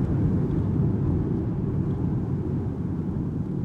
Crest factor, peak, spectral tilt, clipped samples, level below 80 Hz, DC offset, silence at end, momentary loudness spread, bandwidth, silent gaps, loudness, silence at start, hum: 12 dB; -14 dBFS; -11.5 dB/octave; under 0.1%; -38 dBFS; under 0.1%; 0 s; 5 LU; 4 kHz; none; -26 LUFS; 0 s; none